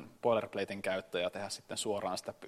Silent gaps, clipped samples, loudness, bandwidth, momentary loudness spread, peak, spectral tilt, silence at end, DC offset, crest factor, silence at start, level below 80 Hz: none; under 0.1%; -36 LUFS; 15 kHz; 6 LU; -16 dBFS; -3.5 dB/octave; 0 s; under 0.1%; 20 dB; 0 s; -74 dBFS